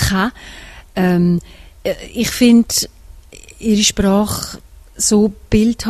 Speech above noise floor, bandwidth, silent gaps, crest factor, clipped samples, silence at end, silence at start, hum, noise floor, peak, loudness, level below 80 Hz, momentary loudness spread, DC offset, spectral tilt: 24 dB; 14 kHz; none; 16 dB; under 0.1%; 0 s; 0 s; none; -39 dBFS; 0 dBFS; -15 LUFS; -34 dBFS; 16 LU; under 0.1%; -4.5 dB/octave